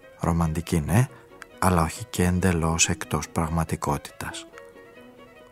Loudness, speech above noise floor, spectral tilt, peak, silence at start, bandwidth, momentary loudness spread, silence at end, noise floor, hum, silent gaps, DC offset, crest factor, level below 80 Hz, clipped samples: -25 LUFS; 24 dB; -5 dB/octave; -4 dBFS; 0.05 s; 16 kHz; 15 LU; 0.1 s; -48 dBFS; none; none; under 0.1%; 20 dB; -40 dBFS; under 0.1%